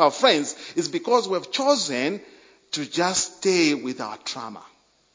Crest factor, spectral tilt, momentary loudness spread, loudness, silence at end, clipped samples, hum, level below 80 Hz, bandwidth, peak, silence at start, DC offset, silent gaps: 22 dB; -2.5 dB/octave; 12 LU; -23 LUFS; 0.5 s; under 0.1%; none; -68 dBFS; 7.8 kHz; -2 dBFS; 0 s; under 0.1%; none